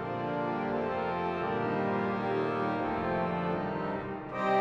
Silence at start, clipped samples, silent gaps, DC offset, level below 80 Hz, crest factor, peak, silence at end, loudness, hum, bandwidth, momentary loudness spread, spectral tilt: 0 s; under 0.1%; none; under 0.1%; -60 dBFS; 14 dB; -16 dBFS; 0 s; -32 LUFS; none; 8.4 kHz; 3 LU; -8 dB/octave